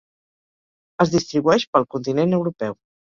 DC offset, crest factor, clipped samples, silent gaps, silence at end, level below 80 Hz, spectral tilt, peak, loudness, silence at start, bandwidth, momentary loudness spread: under 0.1%; 20 dB; under 0.1%; 1.67-1.73 s; 0.35 s; -58 dBFS; -6 dB/octave; -2 dBFS; -20 LUFS; 1 s; 7.6 kHz; 11 LU